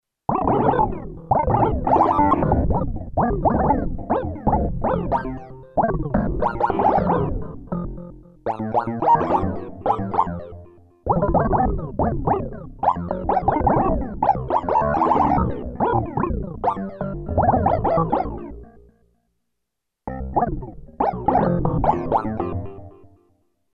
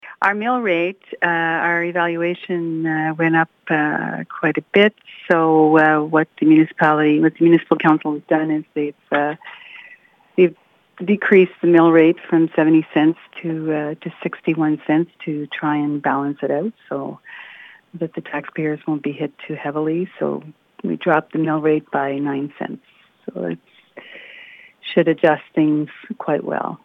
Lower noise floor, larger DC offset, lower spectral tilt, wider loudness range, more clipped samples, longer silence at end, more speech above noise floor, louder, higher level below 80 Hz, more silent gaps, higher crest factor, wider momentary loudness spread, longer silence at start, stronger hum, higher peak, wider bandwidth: first, -81 dBFS vs -48 dBFS; neither; first, -10.5 dB/octave vs -9 dB/octave; second, 4 LU vs 10 LU; neither; first, 0.65 s vs 0.1 s; first, 60 dB vs 30 dB; second, -21 LUFS vs -18 LUFS; first, -32 dBFS vs -76 dBFS; neither; about the same, 18 dB vs 16 dB; second, 13 LU vs 16 LU; first, 0.3 s vs 0.05 s; neither; about the same, -4 dBFS vs -2 dBFS; first, 6.4 kHz vs 4 kHz